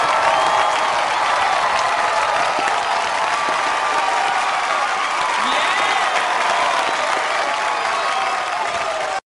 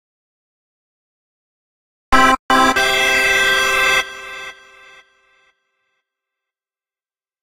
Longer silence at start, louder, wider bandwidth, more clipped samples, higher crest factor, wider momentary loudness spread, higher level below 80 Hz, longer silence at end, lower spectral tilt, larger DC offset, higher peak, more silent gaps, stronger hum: second, 0 s vs 2.1 s; second, -18 LUFS vs -13 LUFS; second, 11.5 kHz vs 16 kHz; neither; about the same, 16 dB vs 20 dB; second, 3 LU vs 17 LU; second, -56 dBFS vs -40 dBFS; second, 0.05 s vs 2.9 s; about the same, -0.5 dB/octave vs -1.5 dB/octave; neither; second, -4 dBFS vs 0 dBFS; second, none vs 2.39-2.49 s; neither